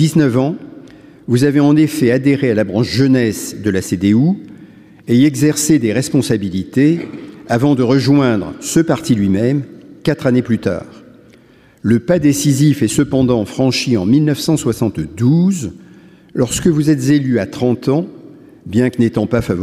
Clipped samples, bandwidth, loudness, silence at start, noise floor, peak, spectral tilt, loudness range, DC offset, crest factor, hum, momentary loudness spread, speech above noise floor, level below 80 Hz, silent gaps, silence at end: under 0.1%; 15.5 kHz; -14 LUFS; 0 s; -46 dBFS; -2 dBFS; -6 dB/octave; 3 LU; under 0.1%; 12 dB; none; 8 LU; 33 dB; -46 dBFS; none; 0 s